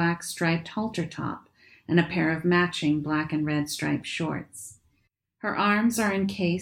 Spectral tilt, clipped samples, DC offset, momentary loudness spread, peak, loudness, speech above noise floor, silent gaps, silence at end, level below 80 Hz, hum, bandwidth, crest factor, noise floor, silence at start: -5.5 dB/octave; under 0.1%; under 0.1%; 12 LU; -8 dBFS; -26 LUFS; 46 dB; none; 0 s; -60 dBFS; none; 17 kHz; 18 dB; -72 dBFS; 0 s